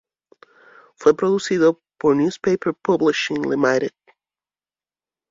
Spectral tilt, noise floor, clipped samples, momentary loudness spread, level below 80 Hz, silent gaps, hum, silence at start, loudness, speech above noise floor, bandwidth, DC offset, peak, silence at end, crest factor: -5.5 dB/octave; under -90 dBFS; under 0.1%; 4 LU; -62 dBFS; none; none; 1 s; -20 LUFS; over 72 dB; 7.8 kHz; under 0.1%; -2 dBFS; 1.4 s; 20 dB